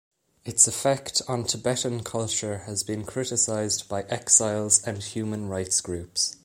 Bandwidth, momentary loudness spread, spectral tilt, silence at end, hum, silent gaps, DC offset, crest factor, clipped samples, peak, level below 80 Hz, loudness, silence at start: 16.5 kHz; 12 LU; -2.5 dB/octave; 0.1 s; none; none; under 0.1%; 24 dB; under 0.1%; -4 dBFS; -58 dBFS; -24 LUFS; 0.45 s